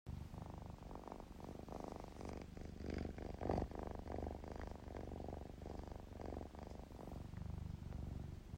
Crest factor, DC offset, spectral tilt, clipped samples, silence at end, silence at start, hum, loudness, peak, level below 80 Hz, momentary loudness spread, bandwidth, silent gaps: 26 dB; under 0.1%; -7.5 dB/octave; under 0.1%; 0 s; 0.05 s; none; -50 LUFS; -24 dBFS; -54 dBFS; 7 LU; 16 kHz; none